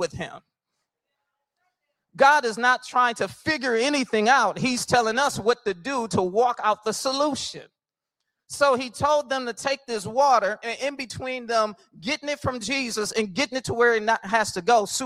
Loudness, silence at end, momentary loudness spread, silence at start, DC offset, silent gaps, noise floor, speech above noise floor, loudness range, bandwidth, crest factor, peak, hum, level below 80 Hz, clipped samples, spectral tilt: -23 LUFS; 0 s; 10 LU; 0 s; under 0.1%; none; -85 dBFS; 62 dB; 4 LU; 16 kHz; 20 dB; -4 dBFS; none; -60 dBFS; under 0.1%; -3 dB/octave